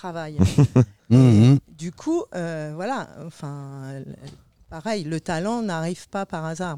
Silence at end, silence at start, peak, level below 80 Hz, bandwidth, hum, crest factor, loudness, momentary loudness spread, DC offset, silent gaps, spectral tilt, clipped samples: 0 s; 0.05 s; -4 dBFS; -48 dBFS; 11 kHz; none; 18 dB; -21 LUFS; 20 LU; 0.2%; none; -7.5 dB/octave; under 0.1%